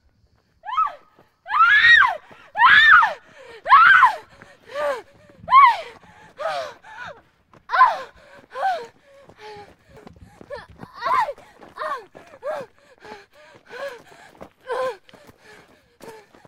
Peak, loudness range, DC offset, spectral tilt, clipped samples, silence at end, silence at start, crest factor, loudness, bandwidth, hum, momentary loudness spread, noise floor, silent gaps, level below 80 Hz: -2 dBFS; 20 LU; under 0.1%; -1.5 dB/octave; under 0.1%; 0.4 s; 0.65 s; 20 dB; -16 LUFS; 14 kHz; none; 26 LU; -62 dBFS; none; -60 dBFS